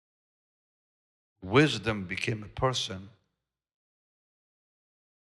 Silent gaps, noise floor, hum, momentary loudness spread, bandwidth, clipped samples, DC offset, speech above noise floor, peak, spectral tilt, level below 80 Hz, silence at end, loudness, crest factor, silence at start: none; -84 dBFS; none; 14 LU; 12 kHz; under 0.1%; under 0.1%; 55 dB; -10 dBFS; -5 dB/octave; -58 dBFS; 2.2 s; -28 LUFS; 24 dB; 1.4 s